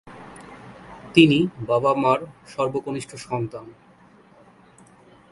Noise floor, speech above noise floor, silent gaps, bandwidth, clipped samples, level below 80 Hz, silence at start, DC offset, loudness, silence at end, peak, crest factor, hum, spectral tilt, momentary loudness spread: -52 dBFS; 31 dB; none; 11.5 kHz; under 0.1%; -58 dBFS; 0.05 s; under 0.1%; -21 LUFS; 1.6 s; 0 dBFS; 24 dB; none; -6 dB/octave; 26 LU